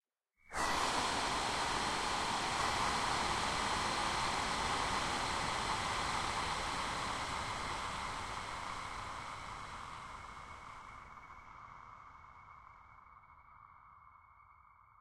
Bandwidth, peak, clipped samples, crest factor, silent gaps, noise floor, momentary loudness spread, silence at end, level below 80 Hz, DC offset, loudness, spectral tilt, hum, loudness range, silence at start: 16 kHz; -22 dBFS; under 0.1%; 18 dB; none; -70 dBFS; 19 LU; 0.5 s; -54 dBFS; under 0.1%; -37 LUFS; -2 dB/octave; none; 20 LU; 0.5 s